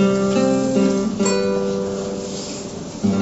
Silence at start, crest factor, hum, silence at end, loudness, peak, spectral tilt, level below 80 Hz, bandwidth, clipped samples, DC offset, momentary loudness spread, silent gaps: 0 s; 14 dB; none; 0 s; -20 LUFS; -6 dBFS; -5.5 dB/octave; -48 dBFS; 8.2 kHz; under 0.1%; under 0.1%; 10 LU; none